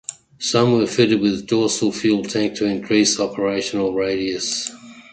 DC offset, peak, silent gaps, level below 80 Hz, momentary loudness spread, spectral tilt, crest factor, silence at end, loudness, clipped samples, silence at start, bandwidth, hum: under 0.1%; -2 dBFS; none; -54 dBFS; 7 LU; -4 dB/octave; 16 dB; 0.1 s; -19 LUFS; under 0.1%; 0.1 s; 9.4 kHz; none